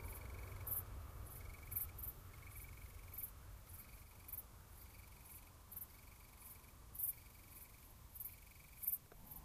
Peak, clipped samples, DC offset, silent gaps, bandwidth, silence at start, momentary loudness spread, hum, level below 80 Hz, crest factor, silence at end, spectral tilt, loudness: -26 dBFS; under 0.1%; under 0.1%; none; 15.5 kHz; 0 s; 16 LU; none; -58 dBFS; 26 dB; 0 s; -3.5 dB/octave; -50 LUFS